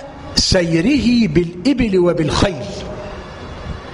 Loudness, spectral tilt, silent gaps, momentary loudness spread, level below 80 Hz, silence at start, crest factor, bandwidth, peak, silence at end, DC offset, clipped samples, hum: -15 LUFS; -5 dB/octave; none; 16 LU; -32 dBFS; 0 s; 16 dB; 11 kHz; 0 dBFS; 0 s; under 0.1%; under 0.1%; none